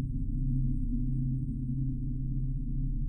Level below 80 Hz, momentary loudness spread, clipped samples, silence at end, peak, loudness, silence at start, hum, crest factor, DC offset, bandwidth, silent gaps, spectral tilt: -34 dBFS; 3 LU; under 0.1%; 0 s; -20 dBFS; -34 LUFS; 0 s; none; 12 dB; under 0.1%; 0.5 kHz; none; -14 dB/octave